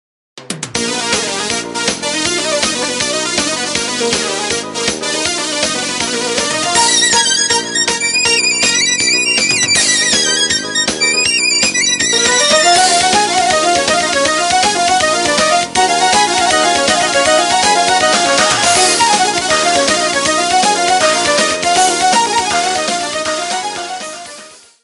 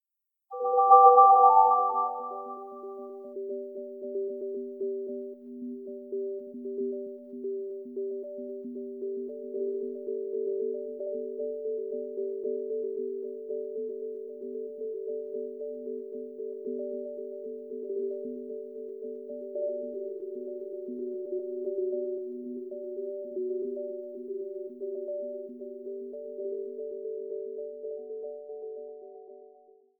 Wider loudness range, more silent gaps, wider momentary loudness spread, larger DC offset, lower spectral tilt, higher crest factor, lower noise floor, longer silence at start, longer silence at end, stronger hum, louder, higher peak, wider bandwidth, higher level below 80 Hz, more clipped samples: second, 5 LU vs 11 LU; neither; second, 7 LU vs 11 LU; neither; second, -0.5 dB/octave vs -10 dB/octave; second, 14 dB vs 26 dB; second, -36 dBFS vs -85 dBFS; second, 0.35 s vs 0.5 s; second, 0.3 s vs 0.55 s; neither; first, -11 LUFS vs -30 LUFS; first, 0 dBFS vs -6 dBFS; first, 11.5 kHz vs 1.5 kHz; first, -46 dBFS vs -90 dBFS; neither